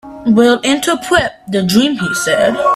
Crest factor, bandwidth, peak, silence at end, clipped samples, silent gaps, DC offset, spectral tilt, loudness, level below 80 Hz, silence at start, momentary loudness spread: 12 dB; 14.5 kHz; 0 dBFS; 0 s; under 0.1%; none; under 0.1%; -4 dB/octave; -13 LUFS; -44 dBFS; 0.05 s; 5 LU